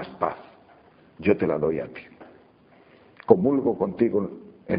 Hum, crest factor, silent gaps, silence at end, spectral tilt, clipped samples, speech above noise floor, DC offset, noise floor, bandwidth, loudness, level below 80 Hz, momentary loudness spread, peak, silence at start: none; 26 dB; none; 0 s; -7.5 dB/octave; under 0.1%; 33 dB; under 0.1%; -55 dBFS; 5 kHz; -24 LUFS; -58 dBFS; 21 LU; 0 dBFS; 0 s